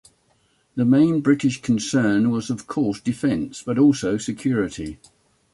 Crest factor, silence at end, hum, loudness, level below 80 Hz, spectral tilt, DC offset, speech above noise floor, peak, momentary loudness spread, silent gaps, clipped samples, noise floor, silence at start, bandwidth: 16 dB; 0.6 s; none; -21 LUFS; -52 dBFS; -6 dB/octave; under 0.1%; 43 dB; -6 dBFS; 10 LU; none; under 0.1%; -63 dBFS; 0.75 s; 11.5 kHz